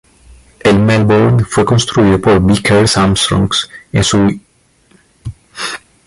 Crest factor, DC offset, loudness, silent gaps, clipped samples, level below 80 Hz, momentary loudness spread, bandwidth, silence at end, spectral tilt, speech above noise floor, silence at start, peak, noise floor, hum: 12 dB; under 0.1%; -11 LUFS; none; under 0.1%; -32 dBFS; 14 LU; 11.5 kHz; 0.3 s; -5 dB/octave; 41 dB; 0.65 s; 0 dBFS; -51 dBFS; none